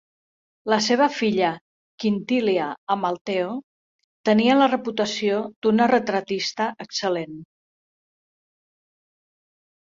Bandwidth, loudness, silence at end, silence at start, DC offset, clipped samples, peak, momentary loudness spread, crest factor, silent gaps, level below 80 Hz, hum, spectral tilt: 7.6 kHz; -22 LUFS; 2.35 s; 0.65 s; under 0.1%; under 0.1%; -4 dBFS; 10 LU; 20 dB; 1.61-1.98 s, 2.78-2.87 s, 3.21-3.25 s, 3.63-4.24 s, 5.56-5.62 s; -68 dBFS; none; -4.5 dB/octave